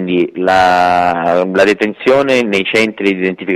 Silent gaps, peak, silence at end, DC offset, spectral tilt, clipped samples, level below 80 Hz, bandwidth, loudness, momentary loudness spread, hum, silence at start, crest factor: none; -2 dBFS; 0 s; under 0.1%; -5 dB/octave; under 0.1%; -48 dBFS; 13.5 kHz; -12 LUFS; 5 LU; none; 0 s; 10 dB